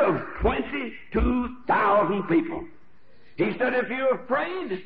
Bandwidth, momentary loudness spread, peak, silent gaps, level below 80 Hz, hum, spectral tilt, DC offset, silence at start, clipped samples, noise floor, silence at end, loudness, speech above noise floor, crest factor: 5 kHz; 11 LU; -10 dBFS; none; -38 dBFS; none; -5 dB/octave; 0.7%; 0 s; under 0.1%; -59 dBFS; 0 s; -25 LUFS; 34 dB; 14 dB